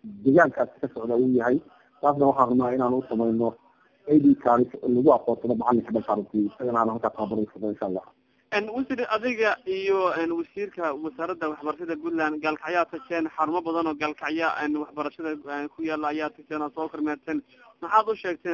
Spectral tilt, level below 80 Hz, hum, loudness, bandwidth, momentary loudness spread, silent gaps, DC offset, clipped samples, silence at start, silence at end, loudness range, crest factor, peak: -7.5 dB/octave; -64 dBFS; none; -25 LUFS; 7.2 kHz; 11 LU; none; under 0.1%; under 0.1%; 0.05 s; 0 s; 6 LU; 22 dB; -4 dBFS